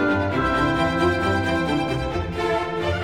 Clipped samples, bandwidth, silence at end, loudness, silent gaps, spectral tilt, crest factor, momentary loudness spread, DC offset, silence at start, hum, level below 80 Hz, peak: under 0.1%; 16 kHz; 0 s; -22 LUFS; none; -6.5 dB/octave; 14 dB; 5 LU; 0.3%; 0 s; none; -38 dBFS; -8 dBFS